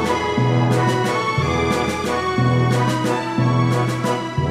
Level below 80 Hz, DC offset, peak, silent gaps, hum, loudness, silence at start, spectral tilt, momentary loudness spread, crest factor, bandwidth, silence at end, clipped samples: -42 dBFS; under 0.1%; -6 dBFS; none; none; -19 LUFS; 0 s; -6 dB/octave; 4 LU; 14 dB; 14 kHz; 0 s; under 0.1%